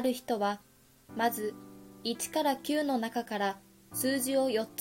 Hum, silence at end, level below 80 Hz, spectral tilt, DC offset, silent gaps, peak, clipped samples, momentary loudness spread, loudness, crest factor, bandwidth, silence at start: none; 0 s; -72 dBFS; -3 dB/octave; under 0.1%; none; -18 dBFS; under 0.1%; 13 LU; -32 LUFS; 14 dB; 16.5 kHz; 0 s